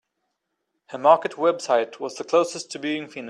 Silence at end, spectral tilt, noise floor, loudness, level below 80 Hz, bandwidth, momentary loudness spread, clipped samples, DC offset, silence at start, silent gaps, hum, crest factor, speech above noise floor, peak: 0 s; -3.5 dB/octave; -78 dBFS; -22 LUFS; -76 dBFS; 11 kHz; 12 LU; under 0.1%; under 0.1%; 0.9 s; none; none; 22 dB; 55 dB; -2 dBFS